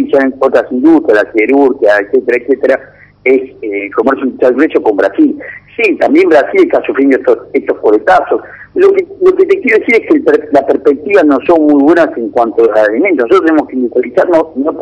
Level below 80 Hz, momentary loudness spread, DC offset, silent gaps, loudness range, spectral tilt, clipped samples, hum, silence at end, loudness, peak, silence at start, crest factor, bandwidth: -50 dBFS; 5 LU; under 0.1%; none; 3 LU; -6.5 dB/octave; 3%; none; 0 s; -9 LUFS; 0 dBFS; 0 s; 8 dB; 8.6 kHz